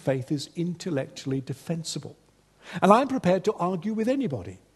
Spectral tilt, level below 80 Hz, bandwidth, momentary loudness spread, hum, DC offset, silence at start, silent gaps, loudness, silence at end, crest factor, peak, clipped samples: -6 dB/octave; -64 dBFS; 12.5 kHz; 14 LU; none; under 0.1%; 0.05 s; none; -26 LUFS; 0.2 s; 26 dB; -2 dBFS; under 0.1%